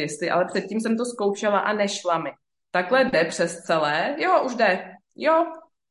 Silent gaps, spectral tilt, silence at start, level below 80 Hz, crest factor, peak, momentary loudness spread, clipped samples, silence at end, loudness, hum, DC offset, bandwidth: none; -4 dB/octave; 0 s; -68 dBFS; 18 dB; -6 dBFS; 7 LU; under 0.1%; 0.3 s; -23 LUFS; none; under 0.1%; 11.5 kHz